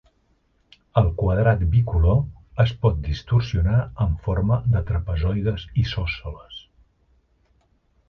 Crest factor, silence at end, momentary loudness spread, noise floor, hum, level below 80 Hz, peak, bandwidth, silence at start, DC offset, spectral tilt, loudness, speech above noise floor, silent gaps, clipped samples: 18 dB; 1.5 s; 9 LU; -64 dBFS; none; -30 dBFS; -4 dBFS; 6.2 kHz; 0.95 s; under 0.1%; -8.5 dB/octave; -22 LUFS; 44 dB; none; under 0.1%